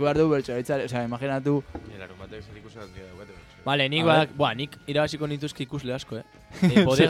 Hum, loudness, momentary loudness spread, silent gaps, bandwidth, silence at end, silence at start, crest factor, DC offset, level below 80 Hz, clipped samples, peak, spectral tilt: none; -25 LUFS; 23 LU; none; 15 kHz; 0 s; 0 s; 20 dB; under 0.1%; -52 dBFS; under 0.1%; -6 dBFS; -6 dB/octave